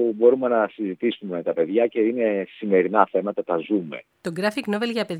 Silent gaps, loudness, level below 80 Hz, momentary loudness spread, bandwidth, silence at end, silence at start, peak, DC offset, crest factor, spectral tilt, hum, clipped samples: none; -23 LUFS; -76 dBFS; 8 LU; 12 kHz; 0 s; 0 s; 0 dBFS; under 0.1%; 22 dB; -6.5 dB/octave; none; under 0.1%